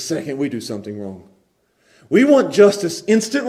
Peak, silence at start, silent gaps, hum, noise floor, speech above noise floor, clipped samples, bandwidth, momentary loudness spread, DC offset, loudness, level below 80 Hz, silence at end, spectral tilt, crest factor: 0 dBFS; 0 s; none; none; -62 dBFS; 45 dB; under 0.1%; 15 kHz; 17 LU; under 0.1%; -16 LUFS; -64 dBFS; 0 s; -5 dB/octave; 18 dB